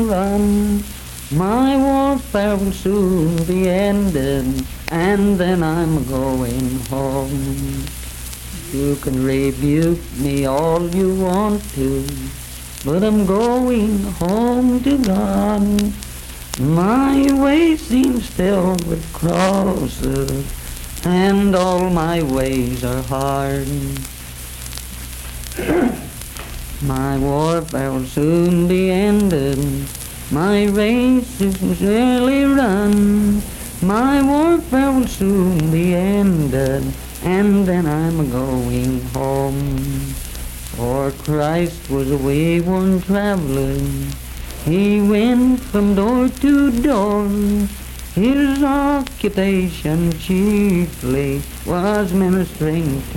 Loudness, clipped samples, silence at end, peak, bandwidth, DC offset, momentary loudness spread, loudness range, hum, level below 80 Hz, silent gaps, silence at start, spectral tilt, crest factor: -17 LUFS; under 0.1%; 0 s; -2 dBFS; 17.5 kHz; under 0.1%; 12 LU; 5 LU; none; -32 dBFS; none; 0 s; -6.5 dB/octave; 14 dB